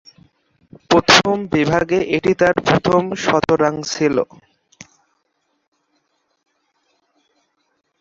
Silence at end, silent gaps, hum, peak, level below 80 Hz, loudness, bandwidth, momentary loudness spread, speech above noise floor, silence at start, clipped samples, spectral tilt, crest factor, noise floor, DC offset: 3.75 s; none; none; 0 dBFS; -48 dBFS; -16 LUFS; 11 kHz; 7 LU; 52 dB; 0.9 s; under 0.1%; -4.5 dB/octave; 20 dB; -69 dBFS; under 0.1%